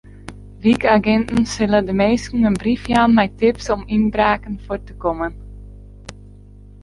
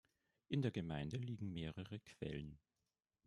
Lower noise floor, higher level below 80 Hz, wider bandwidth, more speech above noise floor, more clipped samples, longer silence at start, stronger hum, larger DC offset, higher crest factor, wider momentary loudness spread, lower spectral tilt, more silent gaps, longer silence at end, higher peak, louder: second, -41 dBFS vs under -90 dBFS; first, -38 dBFS vs -68 dBFS; about the same, 11.5 kHz vs 11 kHz; second, 24 dB vs over 45 dB; neither; second, 0.25 s vs 0.5 s; first, 50 Hz at -35 dBFS vs none; neither; about the same, 16 dB vs 20 dB; first, 23 LU vs 10 LU; second, -6 dB/octave vs -7.5 dB/octave; neither; second, 0.55 s vs 0.7 s; first, -2 dBFS vs -28 dBFS; first, -18 LUFS vs -46 LUFS